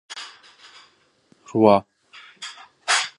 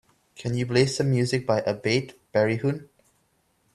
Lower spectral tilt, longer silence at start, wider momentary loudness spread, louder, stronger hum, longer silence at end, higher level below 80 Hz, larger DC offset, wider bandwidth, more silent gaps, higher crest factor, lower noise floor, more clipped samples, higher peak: second, -3.5 dB/octave vs -6 dB/octave; second, 0.1 s vs 0.4 s; first, 20 LU vs 7 LU; first, -20 LUFS vs -25 LUFS; neither; second, 0.1 s vs 0.9 s; about the same, -64 dBFS vs -60 dBFS; neither; about the same, 11.5 kHz vs 12 kHz; neither; about the same, 24 dB vs 20 dB; second, -60 dBFS vs -68 dBFS; neither; first, -2 dBFS vs -6 dBFS